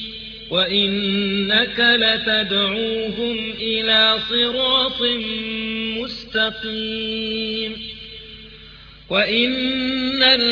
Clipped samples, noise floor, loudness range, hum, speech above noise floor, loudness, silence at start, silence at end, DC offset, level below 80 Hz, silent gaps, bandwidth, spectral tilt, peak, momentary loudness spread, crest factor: under 0.1%; -42 dBFS; 7 LU; none; 22 dB; -18 LUFS; 0 s; 0 s; under 0.1%; -48 dBFS; none; 5.4 kHz; -5.5 dB/octave; -2 dBFS; 13 LU; 18 dB